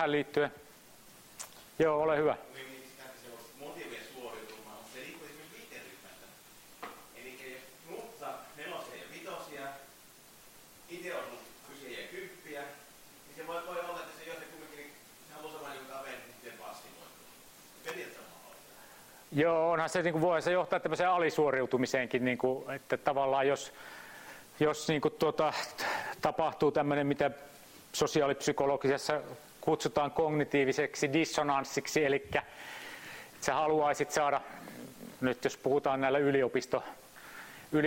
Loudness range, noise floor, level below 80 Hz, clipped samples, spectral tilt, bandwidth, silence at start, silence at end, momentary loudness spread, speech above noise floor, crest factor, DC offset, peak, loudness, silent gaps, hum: 16 LU; -57 dBFS; -68 dBFS; under 0.1%; -4.5 dB/octave; 16.5 kHz; 0 s; 0 s; 21 LU; 26 dB; 24 dB; under 0.1%; -10 dBFS; -32 LUFS; none; none